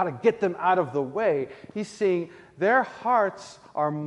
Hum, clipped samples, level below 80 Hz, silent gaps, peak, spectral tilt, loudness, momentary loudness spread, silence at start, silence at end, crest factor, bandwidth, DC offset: none; under 0.1%; -70 dBFS; none; -8 dBFS; -6.5 dB/octave; -25 LUFS; 12 LU; 0 s; 0 s; 16 dB; 11 kHz; under 0.1%